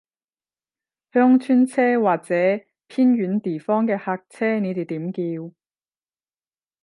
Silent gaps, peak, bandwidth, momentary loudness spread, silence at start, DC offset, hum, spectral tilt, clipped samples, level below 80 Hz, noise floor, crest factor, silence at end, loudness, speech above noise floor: none; -4 dBFS; 11.5 kHz; 12 LU; 1.15 s; under 0.1%; none; -8 dB/octave; under 0.1%; -76 dBFS; under -90 dBFS; 18 dB; 1.35 s; -21 LUFS; over 70 dB